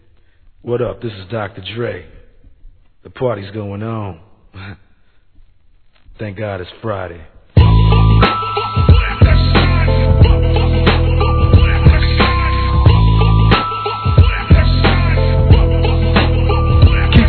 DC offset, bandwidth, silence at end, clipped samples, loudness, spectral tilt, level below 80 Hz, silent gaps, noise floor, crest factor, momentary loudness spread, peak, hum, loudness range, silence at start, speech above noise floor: 0.3%; 4.6 kHz; 0 s; 0.3%; -13 LUFS; -10 dB/octave; -16 dBFS; none; -51 dBFS; 12 dB; 14 LU; 0 dBFS; none; 14 LU; 0.65 s; 28 dB